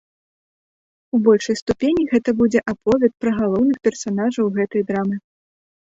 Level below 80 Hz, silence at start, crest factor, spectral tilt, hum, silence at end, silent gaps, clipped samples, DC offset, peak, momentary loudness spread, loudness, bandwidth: -52 dBFS; 1.15 s; 18 dB; -6 dB/octave; none; 0.75 s; 1.62-1.66 s; under 0.1%; under 0.1%; -2 dBFS; 6 LU; -19 LUFS; 7.8 kHz